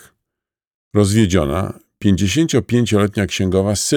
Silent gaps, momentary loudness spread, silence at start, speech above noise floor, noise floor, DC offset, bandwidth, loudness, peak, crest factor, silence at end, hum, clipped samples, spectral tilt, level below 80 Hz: none; 7 LU; 0.95 s; 68 dB; -84 dBFS; under 0.1%; 18.5 kHz; -17 LUFS; -2 dBFS; 16 dB; 0 s; none; under 0.1%; -5.5 dB/octave; -40 dBFS